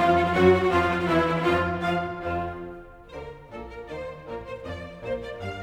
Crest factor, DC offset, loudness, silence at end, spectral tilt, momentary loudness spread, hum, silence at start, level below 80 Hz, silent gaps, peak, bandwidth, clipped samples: 18 dB; under 0.1%; -24 LUFS; 0 s; -7 dB/octave; 21 LU; none; 0 s; -46 dBFS; none; -8 dBFS; 11.5 kHz; under 0.1%